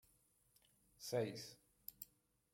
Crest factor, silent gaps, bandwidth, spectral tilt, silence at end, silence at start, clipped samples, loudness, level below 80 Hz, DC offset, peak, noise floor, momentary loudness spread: 22 dB; none; 16.5 kHz; -4.5 dB/octave; 0.5 s; 1 s; under 0.1%; -48 LUFS; -84 dBFS; under 0.1%; -28 dBFS; -77 dBFS; 15 LU